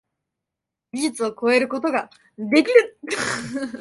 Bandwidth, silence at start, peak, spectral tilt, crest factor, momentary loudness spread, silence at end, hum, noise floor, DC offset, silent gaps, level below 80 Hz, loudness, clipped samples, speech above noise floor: 11.5 kHz; 0.95 s; -2 dBFS; -3.5 dB/octave; 20 dB; 14 LU; 0 s; none; -85 dBFS; under 0.1%; none; -64 dBFS; -21 LUFS; under 0.1%; 64 dB